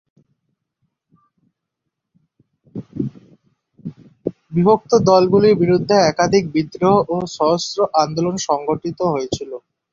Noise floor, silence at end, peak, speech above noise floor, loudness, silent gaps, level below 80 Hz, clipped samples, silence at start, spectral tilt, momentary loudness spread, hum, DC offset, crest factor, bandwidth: -79 dBFS; 0.35 s; -2 dBFS; 63 dB; -17 LUFS; none; -54 dBFS; under 0.1%; 2.75 s; -6 dB/octave; 20 LU; none; under 0.1%; 18 dB; 7.6 kHz